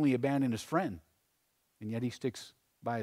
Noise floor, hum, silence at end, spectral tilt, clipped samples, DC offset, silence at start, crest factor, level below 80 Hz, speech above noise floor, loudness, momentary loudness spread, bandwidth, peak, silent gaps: -77 dBFS; none; 0 s; -6.5 dB/octave; under 0.1%; under 0.1%; 0 s; 18 dB; -70 dBFS; 44 dB; -35 LUFS; 18 LU; 15 kHz; -18 dBFS; none